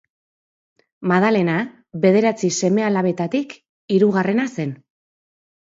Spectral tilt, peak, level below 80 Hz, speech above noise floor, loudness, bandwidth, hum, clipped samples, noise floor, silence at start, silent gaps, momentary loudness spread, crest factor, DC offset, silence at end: -6 dB/octave; -2 dBFS; -66 dBFS; over 72 dB; -19 LUFS; 7.8 kHz; none; under 0.1%; under -90 dBFS; 1 s; 3.69-3.88 s; 12 LU; 18 dB; under 0.1%; 0.85 s